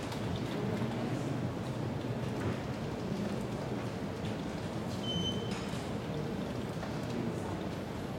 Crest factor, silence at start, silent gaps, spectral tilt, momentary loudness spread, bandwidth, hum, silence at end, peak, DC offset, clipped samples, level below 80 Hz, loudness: 14 dB; 0 s; none; -6 dB/octave; 3 LU; 16.5 kHz; none; 0 s; -22 dBFS; under 0.1%; under 0.1%; -56 dBFS; -37 LUFS